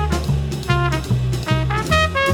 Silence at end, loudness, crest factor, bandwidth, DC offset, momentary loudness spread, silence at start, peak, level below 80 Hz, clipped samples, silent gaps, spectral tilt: 0 s; -19 LUFS; 16 dB; 19 kHz; under 0.1%; 4 LU; 0 s; -2 dBFS; -28 dBFS; under 0.1%; none; -5.5 dB/octave